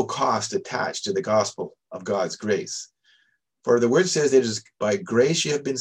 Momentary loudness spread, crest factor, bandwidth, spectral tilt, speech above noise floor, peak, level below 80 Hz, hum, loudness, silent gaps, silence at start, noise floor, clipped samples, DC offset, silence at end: 14 LU; 18 dB; 10.5 kHz; -4 dB/octave; 43 dB; -6 dBFS; -68 dBFS; none; -23 LUFS; none; 0 s; -66 dBFS; under 0.1%; under 0.1%; 0 s